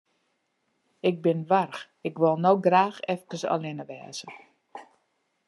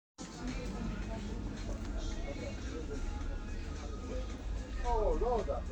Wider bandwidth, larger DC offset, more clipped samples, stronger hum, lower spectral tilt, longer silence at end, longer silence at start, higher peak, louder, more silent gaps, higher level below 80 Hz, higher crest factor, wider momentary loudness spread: first, 12 kHz vs 8.8 kHz; neither; neither; neither; about the same, -6 dB/octave vs -6 dB/octave; first, 0.65 s vs 0 s; first, 1.05 s vs 0.2 s; first, -6 dBFS vs -20 dBFS; first, -25 LUFS vs -40 LUFS; neither; second, -82 dBFS vs -40 dBFS; first, 22 dB vs 16 dB; first, 19 LU vs 9 LU